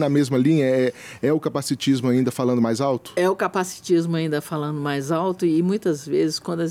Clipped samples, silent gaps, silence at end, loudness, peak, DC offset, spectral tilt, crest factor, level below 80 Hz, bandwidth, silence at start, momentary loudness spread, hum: under 0.1%; none; 0 s; -22 LUFS; -8 dBFS; under 0.1%; -6 dB/octave; 12 dB; -66 dBFS; 16 kHz; 0 s; 7 LU; none